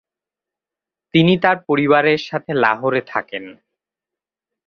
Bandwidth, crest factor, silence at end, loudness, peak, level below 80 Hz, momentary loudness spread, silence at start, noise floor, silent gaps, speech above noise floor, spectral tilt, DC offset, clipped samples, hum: 6.8 kHz; 18 dB; 1.15 s; -17 LUFS; -2 dBFS; -60 dBFS; 11 LU; 1.15 s; -88 dBFS; none; 71 dB; -7.5 dB/octave; under 0.1%; under 0.1%; none